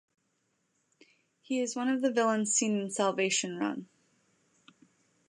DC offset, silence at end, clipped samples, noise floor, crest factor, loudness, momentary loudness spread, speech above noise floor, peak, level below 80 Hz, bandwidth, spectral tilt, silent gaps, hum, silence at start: under 0.1%; 1.45 s; under 0.1%; -77 dBFS; 18 dB; -30 LUFS; 8 LU; 47 dB; -14 dBFS; -84 dBFS; 11.5 kHz; -3 dB/octave; none; none; 1.5 s